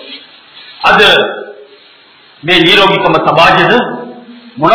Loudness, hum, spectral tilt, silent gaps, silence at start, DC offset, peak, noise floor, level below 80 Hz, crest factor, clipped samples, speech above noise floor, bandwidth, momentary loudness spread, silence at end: -7 LUFS; none; -5 dB/octave; none; 0 s; under 0.1%; 0 dBFS; -41 dBFS; -44 dBFS; 10 dB; 2%; 34 dB; 6 kHz; 20 LU; 0 s